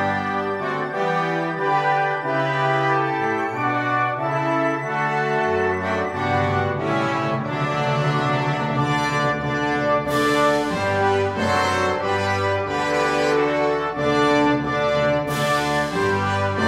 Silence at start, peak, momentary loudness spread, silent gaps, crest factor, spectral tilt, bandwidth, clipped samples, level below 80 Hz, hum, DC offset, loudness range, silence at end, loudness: 0 s; -6 dBFS; 3 LU; none; 14 dB; -5.5 dB/octave; 16 kHz; under 0.1%; -50 dBFS; none; under 0.1%; 2 LU; 0 s; -21 LUFS